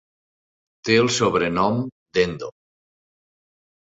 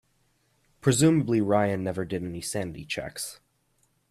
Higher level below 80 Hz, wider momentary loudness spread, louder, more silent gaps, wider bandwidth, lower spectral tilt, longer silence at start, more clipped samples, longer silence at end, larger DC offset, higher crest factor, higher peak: about the same, -54 dBFS vs -58 dBFS; first, 15 LU vs 12 LU; first, -21 LUFS vs -27 LUFS; first, 1.92-2.06 s vs none; second, 8 kHz vs 15 kHz; about the same, -4.5 dB/octave vs -5.5 dB/octave; about the same, 0.85 s vs 0.85 s; neither; first, 1.45 s vs 0.75 s; neither; about the same, 20 dB vs 20 dB; first, -4 dBFS vs -8 dBFS